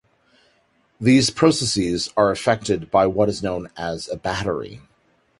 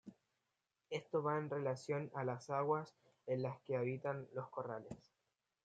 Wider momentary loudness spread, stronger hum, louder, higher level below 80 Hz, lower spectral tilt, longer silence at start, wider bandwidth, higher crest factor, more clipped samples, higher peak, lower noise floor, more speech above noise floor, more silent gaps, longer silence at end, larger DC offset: second, 12 LU vs 15 LU; neither; first, -20 LUFS vs -42 LUFS; first, -48 dBFS vs -84 dBFS; second, -4.5 dB/octave vs -7 dB/octave; first, 1 s vs 0.05 s; first, 11.5 kHz vs 9 kHz; about the same, 20 dB vs 20 dB; neither; first, -2 dBFS vs -24 dBFS; second, -62 dBFS vs -89 dBFS; second, 42 dB vs 47 dB; neither; about the same, 0.6 s vs 0.7 s; neither